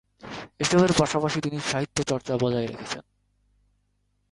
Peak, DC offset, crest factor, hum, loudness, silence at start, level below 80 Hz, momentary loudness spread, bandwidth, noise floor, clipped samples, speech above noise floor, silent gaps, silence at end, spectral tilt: -6 dBFS; under 0.1%; 22 dB; 50 Hz at -55 dBFS; -25 LUFS; 0.25 s; -52 dBFS; 16 LU; 11.5 kHz; -71 dBFS; under 0.1%; 47 dB; none; 1.3 s; -4.5 dB/octave